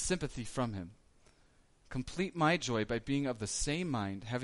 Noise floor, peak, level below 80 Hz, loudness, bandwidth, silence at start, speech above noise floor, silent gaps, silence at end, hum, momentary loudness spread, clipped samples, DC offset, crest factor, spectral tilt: -66 dBFS; -18 dBFS; -52 dBFS; -35 LUFS; 11.5 kHz; 0 s; 31 dB; none; 0 s; none; 11 LU; under 0.1%; under 0.1%; 18 dB; -4.5 dB/octave